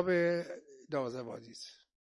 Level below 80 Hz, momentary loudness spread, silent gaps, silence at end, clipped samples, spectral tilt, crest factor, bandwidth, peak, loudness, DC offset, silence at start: -78 dBFS; 19 LU; none; 0.4 s; under 0.1%; -6 dB/octave; 20 dB; 11.5 kHz; -16 dBFS; -36 LUFS; under 0.1%; 0 s